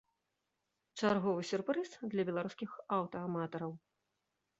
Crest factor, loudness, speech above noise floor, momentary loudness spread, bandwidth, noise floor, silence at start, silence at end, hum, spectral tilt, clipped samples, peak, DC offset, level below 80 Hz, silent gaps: 20 dB; -38 LUFS; 49 dB; 12 LU; 8 kHz; -86 dBFS; 0.95 s; 0.8 s; none; -5.5 dB/octave; under 0.1%; -18 dBFS; under 0.1%; -78 dBFS; none